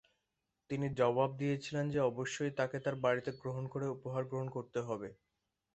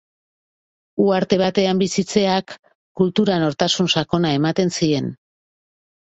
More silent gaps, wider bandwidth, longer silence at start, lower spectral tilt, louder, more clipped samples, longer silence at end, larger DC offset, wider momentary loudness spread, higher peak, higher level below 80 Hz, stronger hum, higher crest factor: second, none vs 2.59-2.63 s, 2.75-2.95 s; about the same, 8.2 kHz vs 8.2 kHz; second, 0.7 s vs 0.95 s; first, -6.5 dB/octave vs -5 dB/octave; second, -37 LUFS vs -19 LUFS; neither; second, 0.6 s vs 0.9 s; neither; first, 9 LU vs 6 LU; second, -18 dBFS vs -2 dBFS; second, -70 dBFS vs -56 dBFS; neither; about the same, 20 dB vs 18 dB